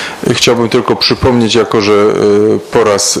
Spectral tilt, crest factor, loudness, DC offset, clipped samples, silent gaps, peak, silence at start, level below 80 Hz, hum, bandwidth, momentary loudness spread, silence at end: -4 dB/octave; 10 dB; -9 LUFS; under 0.1%; under 0.1%; none; 0 dBFS; 0 s; -36 dBFS; none; 14.5 kHz; 2 LU; 0 s